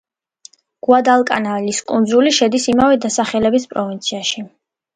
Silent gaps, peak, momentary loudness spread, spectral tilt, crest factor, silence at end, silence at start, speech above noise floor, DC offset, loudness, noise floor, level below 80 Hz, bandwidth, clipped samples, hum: none; 0 dBFS; 9 LU; -3.5 dB/octave; 16 dB; 0.5 s; 0.9 s; 31 dB; under 0.1%; -15 LUFS; -46 dBFS; -52 dBFS; 9.6 kHz; under 0.1%; none